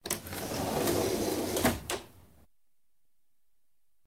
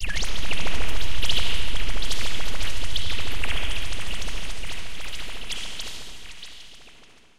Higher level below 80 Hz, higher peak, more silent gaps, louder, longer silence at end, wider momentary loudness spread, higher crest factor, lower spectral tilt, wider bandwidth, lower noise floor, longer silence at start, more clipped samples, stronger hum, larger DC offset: second, -54 dBFS vs -34 dBFS; second, -12 dBFS vs -6 dBFS; neither; about the same, -32 LUFS vs -30 LUFS; first, 1.85 s vs 0 s; second, 7 LU vs 14 LU; first, 22 dB vs 12 dB; first, -4 dB/octave vs -2.5 dB/octave; first, 19.5 kHz vs 15.5 kHz; first, -83 dBFS vs -53 dBFS; about the same, 0.05 s vs 0 s; neither; neither; second, under 0.1% vs 10%